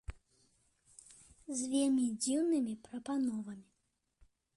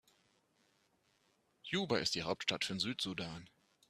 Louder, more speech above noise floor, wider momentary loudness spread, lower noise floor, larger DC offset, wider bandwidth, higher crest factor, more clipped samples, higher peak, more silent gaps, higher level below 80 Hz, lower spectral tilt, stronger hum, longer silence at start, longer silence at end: about the same, -35 LUFS vs -37 LUFS; first, 43 dB vs 38 dB; first, 22 LU vs 12 LU; about the same, -78 dBFS vs -76 dBFS; neither; second, 11.5 kHz vs 13.5 kHz; second, 14 dB vs 24 dB; neither; second, -22 dBFS vs -18 dBFS; neither; first, -60 dBFS vs -72 dBFS; about the same, -4 dB/octave vs -3.5 dB/octave; neither; second, 0.1 s vs 1.65 s; first, 0.95 s vs 0.45 s